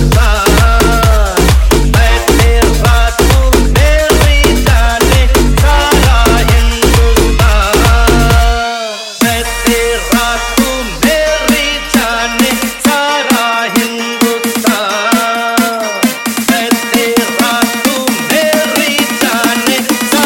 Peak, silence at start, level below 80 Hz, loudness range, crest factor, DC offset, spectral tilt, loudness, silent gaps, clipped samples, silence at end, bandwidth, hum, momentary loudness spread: 0 dBFS; 0 s; -14 dBFS; 3 LU; 10 dB; under 0.1%; -4 dB/octave; -10 LUFS; none; under 0.1%; 0 s; 17 kHz; none; 4 LU